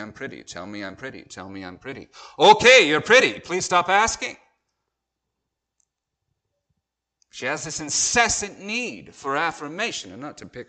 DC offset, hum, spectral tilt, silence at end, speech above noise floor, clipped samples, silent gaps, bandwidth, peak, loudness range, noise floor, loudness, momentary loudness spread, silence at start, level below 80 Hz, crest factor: under 0.1%; none; -1.5 dB/octave; 0.05 s; 60 dB; under 0.1%; none; 9.4 kHz; -2 dBFS; 14 LU; -82 dBFS; -19 LUFS; 23 LU; 0 s; -56 dBFS; 22 dB